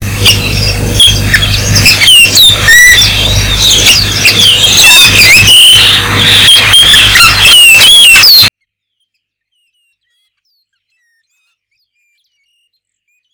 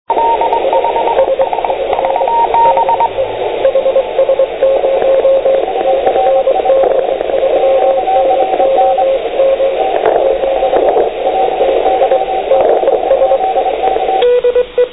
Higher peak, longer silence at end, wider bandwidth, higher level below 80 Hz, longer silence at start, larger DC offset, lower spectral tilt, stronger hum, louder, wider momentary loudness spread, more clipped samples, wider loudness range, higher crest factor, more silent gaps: about the same, 0 dBFS vs 0 dBFS; first, 4.85 s vs 0 s; first, over 20 kHz vs 4 kHz; first, -24 dBFS vs -42 dBFS; about the same, 0 s vs 0.1 s; second, under 0.1% vs 0.8%; second, -1 dB/octave vs -8 dB/octave; neither; first, -1 LUFS vs -11 LUFS; first, 9 LU vs 4 LU; first, 20% vs under 0.1%; first, 4 LU vs 1 LU; about the same, 6 dB vs 10 dB; neither